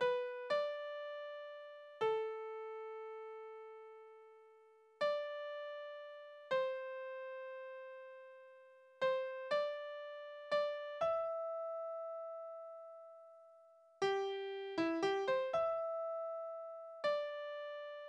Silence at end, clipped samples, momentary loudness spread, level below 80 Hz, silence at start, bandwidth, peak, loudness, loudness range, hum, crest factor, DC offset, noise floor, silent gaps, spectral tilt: 0 s; under 0.1%; 18 LU; -84 dBFS; 0 s; 9.8 kHz; -24 dBFS; -41 LUFS; 6 LU; none; 18 dB; under 0.1%; -66 dBFS; none; -4 dB/octave